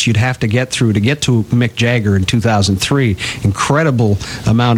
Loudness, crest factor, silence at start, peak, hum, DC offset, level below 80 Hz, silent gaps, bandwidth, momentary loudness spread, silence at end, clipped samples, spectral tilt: -14 LUFS; 10 dB; 0 s; -2 dBFS; none; under 0.1%; -38 dBFS; none; 15 kHz; 3 LU; 0 s; under 0.1%; -5.5 dB/octave